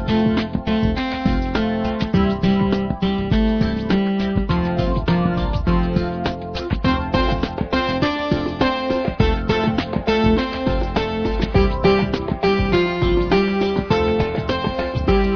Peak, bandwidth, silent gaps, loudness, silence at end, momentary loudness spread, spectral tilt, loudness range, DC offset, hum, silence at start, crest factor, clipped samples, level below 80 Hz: -2 dBFS; 5.4 kHz; none; -20 LUFS; 0 s; 5 LU; -8 dB/octave; 2 LU; under 0.1%; none; 0 s; 16 dB; under 0.1%; -28 dBFS